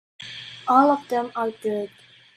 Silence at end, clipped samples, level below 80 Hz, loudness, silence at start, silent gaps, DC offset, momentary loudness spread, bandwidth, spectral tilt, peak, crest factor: 0.5 s; under 0.1%; -74 dBFS; -22 LUFS; 0.2 s; none; under 0.1%; 19 LU; 14.5 kHz; -5.5 dB/octave; -4 dBFS; 20 dB